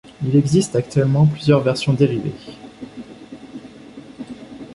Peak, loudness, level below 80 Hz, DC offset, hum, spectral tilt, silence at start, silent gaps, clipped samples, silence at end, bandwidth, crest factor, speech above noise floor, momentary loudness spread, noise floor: -2 dBFS; -17 LUFS; -50 dBFS; under 0.1%; none; -7 dB/octave; 0.2 s; none; under 0.1%; 0 s; 11.5 kHz; 18 dB; 23 dB; 22 LU; -39 dBFS